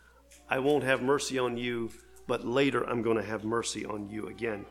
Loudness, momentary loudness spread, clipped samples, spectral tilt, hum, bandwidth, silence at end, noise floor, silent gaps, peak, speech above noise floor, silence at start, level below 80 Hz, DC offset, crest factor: -30 LUFS; 10 LU; under 0.1%; -4.5 dB/octave; none; 15.5 kHz; 0 s; -57 dBFS; none; -10 dBFS; 26 dB; 0.3 s; -60 dBFS; under 0.1%; 20 dB